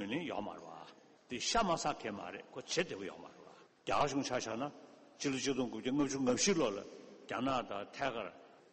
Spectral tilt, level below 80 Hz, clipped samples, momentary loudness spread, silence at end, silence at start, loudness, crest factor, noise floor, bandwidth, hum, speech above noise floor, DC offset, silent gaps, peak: -3.5 dB/octave; -62 dBFS; under 0.1%; 18 LU; 0.1 s; 0 s; -37 LUFS; 18 dB; -60 dBFS; 8.4 kHz; none; 23 dB; under 0.1%; none; -20 dBFS